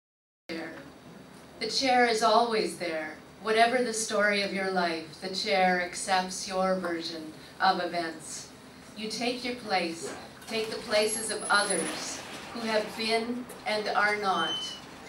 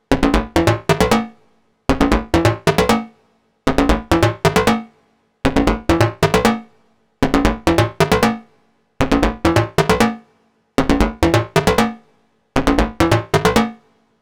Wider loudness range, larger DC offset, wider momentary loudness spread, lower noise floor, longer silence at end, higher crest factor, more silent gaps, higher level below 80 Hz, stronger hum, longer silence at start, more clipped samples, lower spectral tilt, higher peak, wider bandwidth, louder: first, 5 LU vs 1 LU; neither; first, 15 LU vs 7 LU; second, -49 dBFS vs -59 dBFS; second, 0 s vs 0.45 s; about the same, 20 dB vs 16 dB; neither; second, -68 dBFS vs -28 dBFS; neither; first, 0.5 s vs 0.1 s; neither; second, -2.5 dB/octave vs -5.5 dB/octave; second, -10 dBFS vs 0 dBFS; second, 16 kHz vs over 20 kHz; second, -28 LUFS vs -17 LUFS